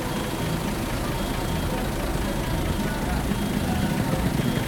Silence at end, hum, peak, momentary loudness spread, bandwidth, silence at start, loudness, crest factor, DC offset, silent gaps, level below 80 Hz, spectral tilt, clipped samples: 0 s; none; -10 dBFS; 3 LU; 19 kHz; 0 s; -26 LUFS; 16 dB; under 0.1%; none; -32 dBFS; -5.5 dB/octave; under 0.1%